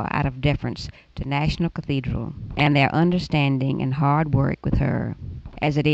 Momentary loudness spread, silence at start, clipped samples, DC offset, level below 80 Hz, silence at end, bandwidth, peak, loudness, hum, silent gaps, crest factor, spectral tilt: 12 LU; 0 s; under 0.1%; under 0.1%; -36 dBFS; 0 s; 7.8 kHz; -6 dBFS; -22 LUFS; none; none; 16 dB; -7.5 dB/octave